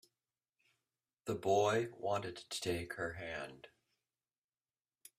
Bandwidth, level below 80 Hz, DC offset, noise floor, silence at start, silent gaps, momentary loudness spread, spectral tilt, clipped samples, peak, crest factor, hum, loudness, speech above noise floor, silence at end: 15 kHz; -70 dBFS; under 0.1%; under -90 dBFS; 1.25 s; none; 13 LU; -4.5 dB/octave; under 0.1%; -20 dBFS; 20 dB; none; -38 LUFS; over 52 dB; 1.5 s